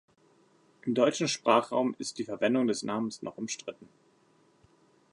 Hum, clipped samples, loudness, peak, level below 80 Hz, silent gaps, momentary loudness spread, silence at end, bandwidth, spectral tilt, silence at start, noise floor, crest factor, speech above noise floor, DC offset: none; under 0.1%; -30 LUFS; -8 dBFS; -78 dBFS; none; 13 LU; 1.3 s; 11 kHz; -4 dB/octave; 0.85 s; -65 dBFS; 24 dB; 36 dB; under 0.1%